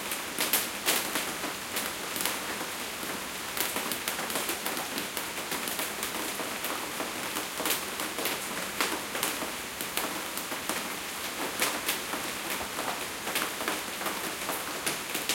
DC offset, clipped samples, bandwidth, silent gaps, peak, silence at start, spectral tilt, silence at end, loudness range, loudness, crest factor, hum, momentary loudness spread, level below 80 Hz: under 0.1%; under 0.1%; 17 kHz; none; -6 dBFS; 0 s; -1 dB/octave; 0 s; 1 LU; -31 LUFS; 26 dB; none; 6 LU; -62 dBFS